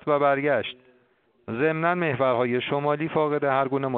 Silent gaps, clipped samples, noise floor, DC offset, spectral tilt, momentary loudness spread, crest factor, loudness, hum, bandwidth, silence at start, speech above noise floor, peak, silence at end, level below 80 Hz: none; under 0.1%; -64 dBFS; under 0.1%; -4.5 dB/octave; 4 LU; 18 dB; -24 LUFS; none; 4.4 kHz; 0.05 s; 40 dB; -8 dBFS; 0 s; -66 dBFS